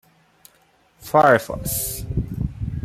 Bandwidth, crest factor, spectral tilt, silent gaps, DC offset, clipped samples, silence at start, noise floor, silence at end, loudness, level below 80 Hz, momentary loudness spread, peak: 16 kHz; 20 dB; -5 dB/octave; none; under 0.1%; under 0.1%; 1 s; -59 dBFS; 0 s; -20 LUFS; -38 dBFS; 13 LU; -2 dBFS